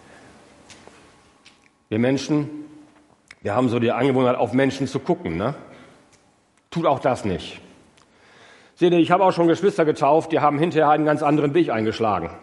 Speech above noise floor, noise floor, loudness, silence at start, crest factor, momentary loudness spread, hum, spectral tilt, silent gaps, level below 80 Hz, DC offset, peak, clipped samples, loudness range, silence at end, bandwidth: 41 dB; -60 dBFS; -20 LUFS; 0.7 s; 20 dB; 11 LU; none; -7 dB/octave; none; -60 dBFS; under 0.1%; -2 dBFS; under 0.1%; 9 LU; 0 s; 11.5 kHz